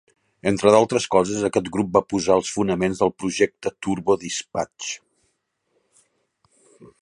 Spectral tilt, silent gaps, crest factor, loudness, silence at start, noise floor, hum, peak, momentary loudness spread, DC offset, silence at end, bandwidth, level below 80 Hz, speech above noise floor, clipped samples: -4.5 dB/octave; none; 22 dB; -21 LUFS; 0.45 s; -72 dBFS; none; -2 dBFS; 12 LU; under 0.1%; 0.15 s; 11.5 kHz; -54 dBFS; 51 dB; under 0.1%